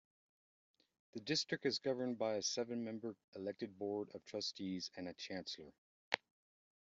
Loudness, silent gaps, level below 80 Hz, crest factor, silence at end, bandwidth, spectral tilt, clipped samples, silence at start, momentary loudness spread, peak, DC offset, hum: -43 LUFS; 3.24-3.33 s, 5.78-6.12 s; -84 dBFS; 30 dB; 0.75 s; 8 kHz; -3 dB/octave; under 0.1%; 1.15 s; 10 LU; -16 dBFS; under 0.1%; none